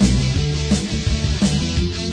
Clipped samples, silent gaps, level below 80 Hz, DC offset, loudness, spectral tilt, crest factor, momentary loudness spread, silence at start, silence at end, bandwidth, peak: under 0.1%; none; -24 dBFS; under 0.1%; -19 LUFS; -5 dB/octave; 14 dB; 3 LU; 0 s; 0 s; 10.5 kHz; -4 dBFS